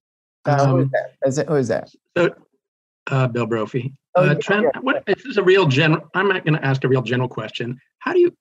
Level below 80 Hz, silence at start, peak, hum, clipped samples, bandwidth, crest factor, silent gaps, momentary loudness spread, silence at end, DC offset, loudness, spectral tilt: -66 dBFS; 0.45 s; -4 dBFS; none; under 0.1%; 8.4 kHz; 16 dB; 2.68-3.06 s, 4.09-4.13 s; 11 LU; 0.1 s; under 0.1%; -20 LUFS; -6.5 dB/octave